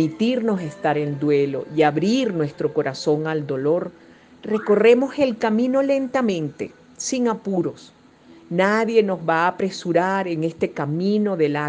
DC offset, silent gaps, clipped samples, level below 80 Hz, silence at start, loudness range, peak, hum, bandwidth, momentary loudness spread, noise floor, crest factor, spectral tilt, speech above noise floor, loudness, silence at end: under 0.1%; none; under 0.1%; -66 dBFS; 0 s; 3 LU; -4 dBFS; none; 9.8 kHz; 8 LU; -49 dBFS; 18 dB; -6 dB/octave; 28 dB; -21 LUFS; 0 s